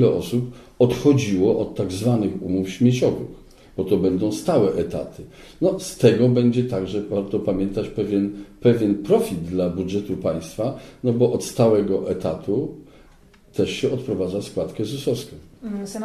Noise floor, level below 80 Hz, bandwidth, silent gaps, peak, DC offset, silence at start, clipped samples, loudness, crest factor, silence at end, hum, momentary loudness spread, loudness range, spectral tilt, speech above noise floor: -51 dBFS; -48 dBFS; 14 kHz; none; -2 dBFS; under 0.1%; 0 s; under 0.1%; -22 LUFS; 18 dB; 0 s; none; 11 LU; 4 LU; -7 dB/octave; 30 dB